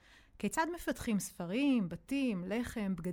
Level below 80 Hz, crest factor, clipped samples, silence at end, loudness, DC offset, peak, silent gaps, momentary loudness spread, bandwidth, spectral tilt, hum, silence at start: -58 dBFS; 14 dB; under 0.1%; 0 s; -36 LUFS; under 0.1%; -22 dBFS; none; 6 LU; 18 kHz; -5 dB/octave; none; 0.4 s